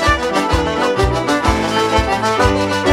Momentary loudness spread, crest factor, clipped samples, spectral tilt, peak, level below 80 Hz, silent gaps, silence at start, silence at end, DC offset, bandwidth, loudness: 2 LU; 14 dB; under 0.1%; -5 dB/octave; 0 dBFS; -26 dBFS; none; 0 s; 0 s; under 0.1%; 16 kHz; -15 LUFS